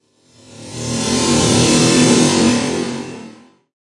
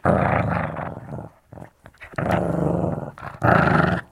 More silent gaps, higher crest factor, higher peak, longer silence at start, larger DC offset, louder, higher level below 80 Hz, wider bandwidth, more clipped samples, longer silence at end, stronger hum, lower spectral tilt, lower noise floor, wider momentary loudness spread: neither; about the same, 16 dB vs 18 dB; first, 0 dBFS vs -4 dBFS; first, 0.55 s vs 0.05 s; neither; first, -14 LUFS vs -22 LUFS; about the same, -46 dBFS vs -42 dBFS; about the same, 11.5 kHz vs 12.5 kHz; neither; first, 0.6 s vs 0.1 s; neither; second, -4 dB/octave vs -8.5 dB/octave; about the same, -48 dBFS vs -45 dBFS; about the same, 17 LU vs 19 LU